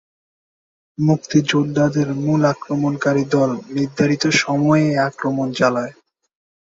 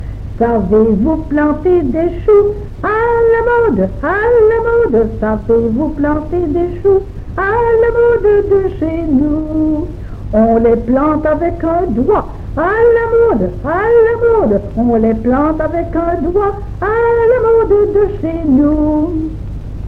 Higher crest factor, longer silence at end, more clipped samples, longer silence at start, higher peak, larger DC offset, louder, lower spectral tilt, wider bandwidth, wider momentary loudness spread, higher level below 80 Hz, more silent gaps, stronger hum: first, 16 dB vs 10 dB; first, 0.75 s vs 0 s; neither; first, 1 s vs 0 s; about the same, -2 dBFS vs -2 dBFS; neither; second, -18 LUFS vs -13 LUFS; second, -6 dB/octave vs -10 dB/octave; first, 7.8 kHz vs 4.5 kHz; about the same, 6 LU vs 7 LU; second, -56 dBFS vs -26 dBFS; neither; neither